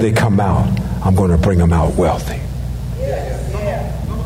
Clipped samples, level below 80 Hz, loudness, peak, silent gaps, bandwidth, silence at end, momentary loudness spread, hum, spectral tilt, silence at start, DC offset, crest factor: under 0.1%; -24 dBFS; -17 LUFS; -4 dBFS; none; 16 kHz; 0 s; 10 LU; 60 Hz at -25 dBFS; -7.5 dB/octave; 0 s; under 0.1%; 12 dB